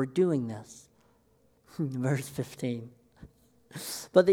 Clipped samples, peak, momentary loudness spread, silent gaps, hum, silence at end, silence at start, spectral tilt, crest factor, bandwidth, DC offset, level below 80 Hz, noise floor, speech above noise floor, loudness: under 0.1%; -8 dBFS; 21 LU; none; none; 0 s; 0 s; -6 dB/octave; 22 dB; 18.5 kHz; under 0.1%; -66 dBFS; -66 dBFS; 38 dB; -31 LUFS